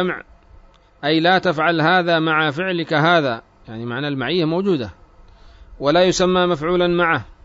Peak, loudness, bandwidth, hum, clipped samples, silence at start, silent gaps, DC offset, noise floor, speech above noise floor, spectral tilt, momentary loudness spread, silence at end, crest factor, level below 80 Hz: -4 dBFS; -18 LUFS; 7.8 kHz; none; under 0.1%; 0 s; none; under 0.1%; -48 dBFS; 30 dB; -5 dB/octave; 11 LU; 0.1 s; 16 dB; -48 dBFS